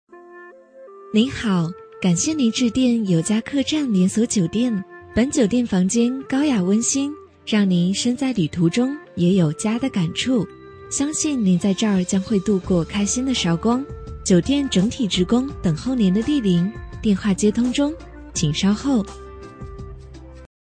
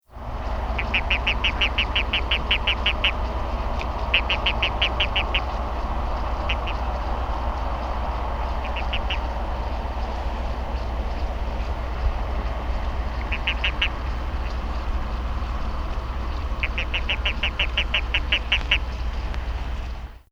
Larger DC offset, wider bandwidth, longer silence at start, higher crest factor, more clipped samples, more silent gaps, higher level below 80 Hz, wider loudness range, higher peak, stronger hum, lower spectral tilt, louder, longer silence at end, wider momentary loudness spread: neither; first, 10.5 kHz vs 7.2 kHz; about the same, 0.15 s vs 0.1 s; about the same, 16 dB vs 20 dB; neither; neither; second, -42 dBFS vs -28 dBFS; second, 1 LU vs 6 LU; about the same, -4 dBFS vs -4 dBFS; neither; about the same, -5 dB/octave vs -5 dB/octave; first, -20 LUFS vs -25 LUFS; about the same, 0.2 s vs 0.15 s; about the same, 9 LU vs 9 LU